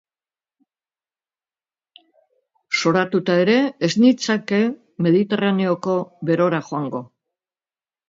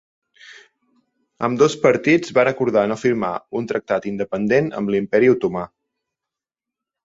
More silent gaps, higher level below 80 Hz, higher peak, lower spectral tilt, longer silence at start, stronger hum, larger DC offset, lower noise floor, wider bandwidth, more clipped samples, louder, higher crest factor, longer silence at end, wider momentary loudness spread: neither; second, -68 dBFS vs -58 dBFS; about the same, -4 dBFS vs -2 dBFS; about the same, -6 dB/octave vs -6 dB/octave; first, 2.7 s vs 0.45 s; neither; neither; about the same, under -90 dBFS vs -87 dBFS; about the same, 7.8 kHz vs 8 kHz; neither; about the same, -19 LUFS vs -19 LUFS; about the same, 18 dB vs 18 dB; second, 1.05 s vs 1.4 s; about the same, 8 LU vs 9 LU